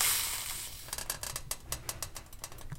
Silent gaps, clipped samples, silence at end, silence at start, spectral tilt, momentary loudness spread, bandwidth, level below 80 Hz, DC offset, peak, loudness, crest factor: none; under 0.1%; 0 s; 0 s; -0.5 dB/octave; 13 LU; 17 kHz; -50 dBFS; under 0.1%; -14 dBFS; -36 LUFS; 24 dB